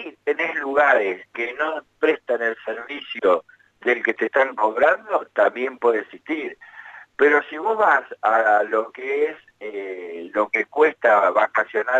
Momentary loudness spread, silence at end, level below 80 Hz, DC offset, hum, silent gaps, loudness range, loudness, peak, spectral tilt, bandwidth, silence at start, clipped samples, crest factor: 14 LU; 0 s; -70 dBFS; under 0.1%; none; none; 2 LU; -21 LUFS; -4 dBFS; -4.5 dB/octave; 7.8 kHz; 0 s; under 0.1%; 18 dB